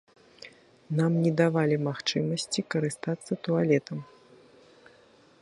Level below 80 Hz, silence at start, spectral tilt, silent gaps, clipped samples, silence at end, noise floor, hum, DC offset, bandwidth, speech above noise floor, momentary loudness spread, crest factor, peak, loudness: -72 dBFS; 0.45 s; -6 dB/octave; none; under 0.1%; 1.35 s; -58 dBFS; none; under 0.1%; 11.5 kHz; 32 dB; 18 LU; 20 dB; -10 dBFS; -27 LUFS